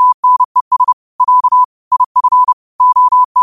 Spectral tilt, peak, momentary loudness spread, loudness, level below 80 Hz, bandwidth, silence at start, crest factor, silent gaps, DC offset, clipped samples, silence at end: -1.5 dB/octave; -2 dBFS; 5 LU; -11 LUFS; -62 dBFS; 1.4 kHz; 0 s; 8 dB; 0.14-0.23 s, 0.45-0.55 s, 0.61-0.71 s, 0.93-1.19 s, 1.65-1.91 s, 2.06-2.15 s, 2.53-2.79 s, 3.25-3.35 s; 0.3%; under 0.1%; 0 s